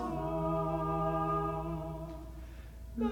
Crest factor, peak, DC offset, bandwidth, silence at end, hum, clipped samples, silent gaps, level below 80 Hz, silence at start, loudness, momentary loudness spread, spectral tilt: 14 dB; -22 dBFS; under 0.1%; 17.5 kHz; 0 s; none; under 0.1%; none; -46 dBFS; 0 s; -35 LUFS; 16 LU; -8.5 dB/octave